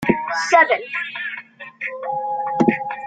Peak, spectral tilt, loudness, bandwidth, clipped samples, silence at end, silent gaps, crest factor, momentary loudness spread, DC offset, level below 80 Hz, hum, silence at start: -2 dBFS; -5 dB/octave; -20 LUFS; 9.4 kHz; under 0.1%; 0 s; none; 18 dB; 15 LU; under 0.1%; -58 dBFS; none; 0 s